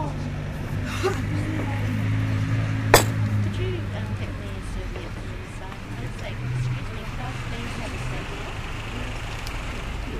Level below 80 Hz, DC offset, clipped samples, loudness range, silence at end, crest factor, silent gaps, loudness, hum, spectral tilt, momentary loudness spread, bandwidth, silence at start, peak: -36 dBFS; under 0.1%; under 0.1%; 8 LU; 0 s; 26 dB; none; -27 LUFS; none; -5 dB/octave; 9 LU; 15.5 kHz; 0 s; 0 dBFS